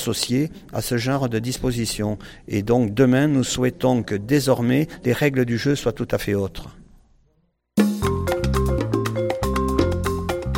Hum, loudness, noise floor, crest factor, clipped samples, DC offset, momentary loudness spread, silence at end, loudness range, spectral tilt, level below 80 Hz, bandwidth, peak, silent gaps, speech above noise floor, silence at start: none; -22 LUFS; -66 dBFS; 18 dB; under 0.1%; under 0.1%; 7 LU; 0 s; 4 LU; -5.5 dB/octave; -36 dBFS; 17 kHz; -4 dBFS; none; 45 dB; 0 s